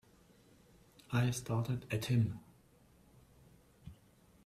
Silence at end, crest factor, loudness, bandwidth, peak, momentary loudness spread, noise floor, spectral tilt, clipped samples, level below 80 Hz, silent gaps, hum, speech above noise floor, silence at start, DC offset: 0.5 s; 18 dB; -36 LUFS; 14.5 kHz; -20 dBFS; 24 LU; -66 dBFS; -6 dB/octave; under 0.1%; -66 dBFS; none; none; 31 dB; 1.1 s; under 0.1%